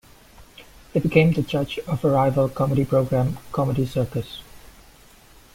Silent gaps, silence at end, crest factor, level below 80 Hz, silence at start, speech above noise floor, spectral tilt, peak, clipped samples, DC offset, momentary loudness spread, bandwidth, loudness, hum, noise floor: none; 0.9 s; 20 dB; -46 dBFS; 0.4 s; 29 dB; -7.5 dB/octave; -2 dBFS; under 0.1%; under 0.1%; 9 LU; 16.5 kHz; -22 LUFS; none; -50 dBFS